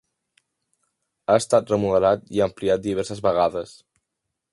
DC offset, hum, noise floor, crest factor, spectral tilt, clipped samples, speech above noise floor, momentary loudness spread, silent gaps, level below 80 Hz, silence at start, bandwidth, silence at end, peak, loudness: under 0.1%; none; -81 dBFS; 20 dB; -5.5 dB/octave; under 0.1%; 60 dB; 10 LU; none; -54 dBFS; 1.3 s; 11.5 kHz; 0.85 s; -2 dBFS; -22 LUFS